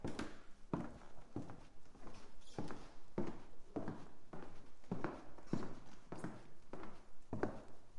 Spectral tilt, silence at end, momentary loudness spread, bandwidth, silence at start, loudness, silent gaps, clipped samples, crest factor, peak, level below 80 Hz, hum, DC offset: -7 dB/octave; 0 s; 14 LU; 11 kHz; 0 s; -50 LUFS; none; under 0.1%; 20 dB; -22 dBFS; -60 dBFS; none; under 0.1%